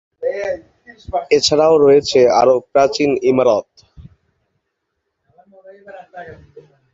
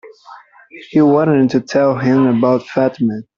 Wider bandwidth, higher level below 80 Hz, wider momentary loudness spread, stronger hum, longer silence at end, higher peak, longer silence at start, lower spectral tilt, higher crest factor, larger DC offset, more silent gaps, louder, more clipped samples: first, 8 kHz vs 7.2 kHz; first, -50 dBFS vs -56 dBFS; first, 19 LU vs 6 LU; neither; first, 0.6 s vs 0.15 s; about the same, -2 dBFS vs -2 dBFS; first, 0.2 s vs 0.05 s; second, -4 dB/octave vs -8 dB/octave; about the same, 16 dB vs 12 dB; neither; neither; about the same, -14 LUFS vs -14 LUFS; neither